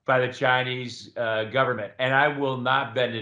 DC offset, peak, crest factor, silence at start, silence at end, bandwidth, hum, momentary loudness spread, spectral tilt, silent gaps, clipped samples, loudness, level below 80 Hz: under 0.1%; -6 dBFS; 18 dB; 0.1 s; 0 s; 9.6 kHz; none; 8 LU; -5.5 dB/octave; none; under 0.1%; -24 LUFS; -72 dBFS